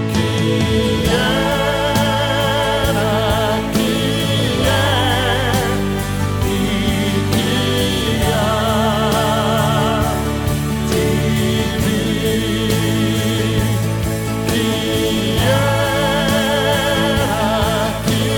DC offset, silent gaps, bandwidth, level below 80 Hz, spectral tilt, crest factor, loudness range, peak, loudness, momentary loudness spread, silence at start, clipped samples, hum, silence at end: under 0.1%; none; 17.5 kHz; -30 dBFS; -5 dB/octave; 14 dB; 1 LU; -2 dBFS; -16 LUFS; 3 LU; 0 s; under 0.1%; none; 0 s